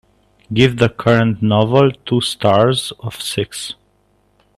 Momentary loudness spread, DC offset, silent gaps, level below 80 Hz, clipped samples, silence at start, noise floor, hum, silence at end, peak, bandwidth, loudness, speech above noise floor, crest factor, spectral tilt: 12 LU; under 0.1%; none; -48 dBFS; under 0.1%; 0.5 s; -58 dBFS; 50 Hz at -40 dBFS; 0.85 s; 0 dBFS; 13.5 kHz; -15 LUFS; 43 dB; 16 dB; -5.5 dB/octave